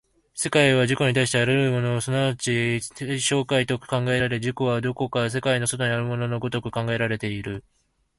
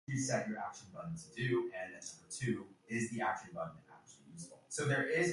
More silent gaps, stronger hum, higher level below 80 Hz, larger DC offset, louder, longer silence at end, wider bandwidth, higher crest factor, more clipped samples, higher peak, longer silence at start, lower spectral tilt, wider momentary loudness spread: neither; neither; first, -54 dBFS vs -72 dBFS; neither; first, -23 LUFS vs -39 LUFS; first, 0.6 s vs 0 s; about the same, 11.5 kHz vs 11.5 kHz; about the same, 20 dB vs 16 dB; neither; first, -2 dBFS vs -22 dBFS; first, 0.35 s vs 0.1 s; about the same, -4.5 dB/octave vs -5 dB/octave; second, 8 LU vs 17 LU